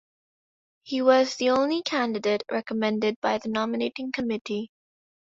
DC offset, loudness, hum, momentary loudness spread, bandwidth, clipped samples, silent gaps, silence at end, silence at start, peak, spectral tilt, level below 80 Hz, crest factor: under 0.1%; -26 LUFS; none; 9 LU; 7.8 kHz; under 0.1%; 3.16-3.22 s, 4.41-4.45 s; 0.6 s; 0.85 s; -6 dBFS; -4.5 dB/octave; -68 dBFS; 20 dB